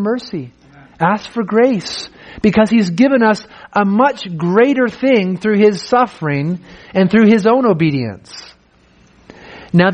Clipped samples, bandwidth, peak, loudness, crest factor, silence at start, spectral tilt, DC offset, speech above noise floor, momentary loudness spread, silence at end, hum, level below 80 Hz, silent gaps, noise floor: under 0.1%; 9.4 kHz; 0 dBFS; -14 LUFS; 14 dB; 0 s; -7 dB/octave; under 0.1%; 36 dB; 14 LU; 0 s; none; -50 dBFS; none; -50 dBFS